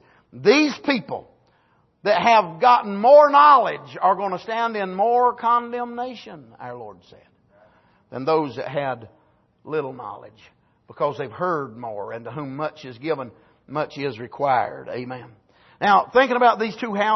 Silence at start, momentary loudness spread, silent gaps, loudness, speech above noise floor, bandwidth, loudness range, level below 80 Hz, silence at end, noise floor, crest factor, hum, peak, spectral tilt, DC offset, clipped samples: 0.35 s; 19 LU; none; -20 LUFS; 42 dB; 6.2 kHz; 13 LU; -68 dBFS; 0 s; -62 dBFS; 18 dB; none; -2 dBFS; -5.5 dB/octave; under 0.1%; under 0.1%